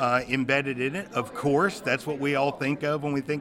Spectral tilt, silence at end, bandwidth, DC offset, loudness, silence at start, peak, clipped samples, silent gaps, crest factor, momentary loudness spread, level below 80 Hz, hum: -5.5 dB/octave; 0 s; 16 kHz; under 0.1%; -26 LUFS; 0 s; -8 dBFS; under 0.1%; none; 18 dB; 5 LU; -60 dBFS; none